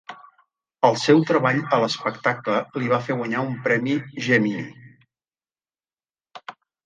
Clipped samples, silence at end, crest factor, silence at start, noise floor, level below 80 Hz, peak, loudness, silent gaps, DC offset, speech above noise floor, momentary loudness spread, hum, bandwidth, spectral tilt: under 0.1%; 0.35 s; 22 dB; 0.1 s; under -90 dBFS; -70 dBFS; 0 dBFS; -21 LUFS; none; under 0.1%; over 69 dB; 21 LU; none; 9.6 kHz; -6 dB/octave